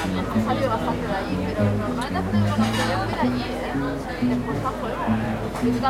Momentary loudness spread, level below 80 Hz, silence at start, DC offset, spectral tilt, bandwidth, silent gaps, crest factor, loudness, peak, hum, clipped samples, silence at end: 5 LU; -38 dBFS; 0 s; under 0.1%; -6.5 dB/octave; 16 kHz; none; 16 dB; -24 LUFS; -8 dBFS; none; under 0.1%; 0 s